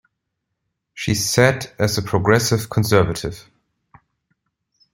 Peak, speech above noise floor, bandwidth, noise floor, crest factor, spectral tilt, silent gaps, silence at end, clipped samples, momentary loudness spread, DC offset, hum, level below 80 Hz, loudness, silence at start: -2 dBFS; 59 dB; 16.5 kHz; -77 dBFS; 20 dB; -4.5 dB/octave; none; 1.55 s; under 0.1%; 12 LU; under 0.1%; none; -46 dBFS; -18 LUFS; 0.95 s